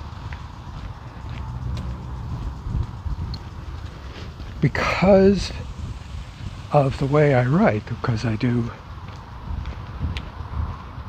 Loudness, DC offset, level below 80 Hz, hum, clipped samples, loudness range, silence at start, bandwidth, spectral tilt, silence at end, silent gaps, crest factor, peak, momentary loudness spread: -23 LUFS; under 0.1%; -34 dBFS; none; under 0.1%; 12 LU; 0 s; 9.4 kHz; -7.5 dB/octave; 0 s; none; 20 dB; -4 dBFS; 19 LU